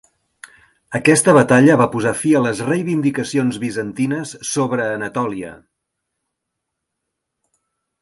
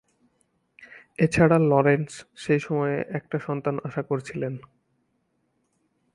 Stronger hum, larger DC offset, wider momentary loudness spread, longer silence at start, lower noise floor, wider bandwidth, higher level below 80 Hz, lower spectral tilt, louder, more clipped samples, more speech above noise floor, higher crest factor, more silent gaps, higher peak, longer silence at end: neither; neither; second, 12 LU vs 15 LU; about the same, 0.9 s vs 0.8 s; first, -78 dBFS vs -72 dBFS; about the same, 11.5 kHz vs 11.5 kHz; about the same, -58 dBFS vs -56 dBFS; second, -5.5 dB/octave vs -7.5 dB/octave; first, -17 LUFS vs -24 LUFS; neither; first, 62 dB vs 48 dB; about the same, 18 dB vs 20 dB; neither; first, 0 dBFS vs -6 dBFS; first, 2.45 s vs 1.55 s